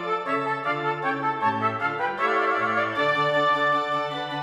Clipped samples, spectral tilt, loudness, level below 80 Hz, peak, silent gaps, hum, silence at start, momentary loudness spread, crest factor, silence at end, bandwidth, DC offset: under 0.1%; -5.5 dB/octave; -24 LUFS; -68 dBFS; -10 dBFS; none; none; 0 s; 5 LU; 14 dB; 0 s; 13 kHz; under 0.1%